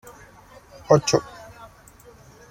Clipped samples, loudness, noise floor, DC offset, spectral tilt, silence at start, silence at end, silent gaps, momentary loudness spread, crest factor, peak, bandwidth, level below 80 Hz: under 0.1%; -20 LUFS; -49 dBFS; under 0.1%; -5 dB/octave; 0.9 s; 1.3 s; none; 27 LU; 24 dB; -2 dBFS; 16.5 kHz; -54 dBFS